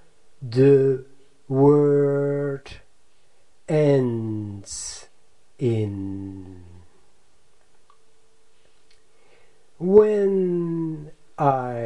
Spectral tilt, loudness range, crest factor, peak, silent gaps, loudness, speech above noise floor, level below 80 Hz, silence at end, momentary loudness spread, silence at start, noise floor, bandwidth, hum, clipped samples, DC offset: -7.5 dB/octave; 11 LU; 22 dB; -2 dBFS; none; -21 LUFS; 44 dB; -58 dBFS; 0 s; 19 LU; 0.4 s; -64 dBFS; 11 kHz; none; under 0.1%; 0.5%